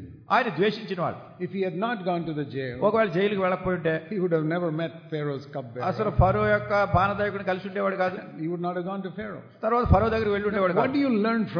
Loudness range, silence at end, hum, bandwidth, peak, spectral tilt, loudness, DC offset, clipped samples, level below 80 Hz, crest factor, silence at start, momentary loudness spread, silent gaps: 2 LU; 0 s; none; 5.4 kHz; -6 dBFS; -8.5 dB/octave; -26 LUFS; under 0.1%; under 0.1%; -42 dBFS; 20 dB; 0 s; 10 LU; none